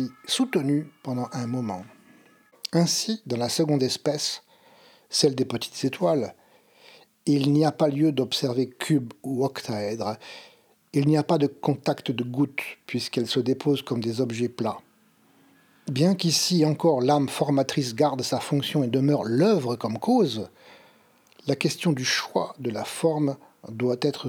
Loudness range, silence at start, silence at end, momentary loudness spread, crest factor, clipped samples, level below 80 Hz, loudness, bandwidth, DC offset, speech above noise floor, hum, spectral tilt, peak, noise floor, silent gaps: 4 LU; 0 s; 0 s; 10 LU; 18 dB; under 0.1%; -74 dBFS; -25 LUFS; 18 kHz; under 0.1%; 36 dB; none; -5 dB/octave; -8 dBFS; -61 dBFS; none